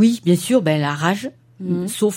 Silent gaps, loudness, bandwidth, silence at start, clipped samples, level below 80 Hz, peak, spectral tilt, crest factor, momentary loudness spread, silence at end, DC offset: none; -19 LUFS; 16.5 kHz; 0 s; under 0.1%; -64 dBFS; -2 dBFS; -5.5 dB/octave; 16 dB; 11 LU; 0 s; under 0.1%